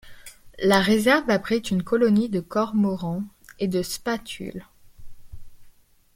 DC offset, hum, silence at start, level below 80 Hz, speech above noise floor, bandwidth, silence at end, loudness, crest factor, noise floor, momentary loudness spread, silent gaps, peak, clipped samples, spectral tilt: under 0.1%; none; 0.05 s; -50 dBFS; 30 dB; 16.5 kHz; 0.45 s; -23 LUFS; 20 dB; -52 dBFS; 15 LU; none; -6 dBFS; under 0.1%; -5.5 dB/octave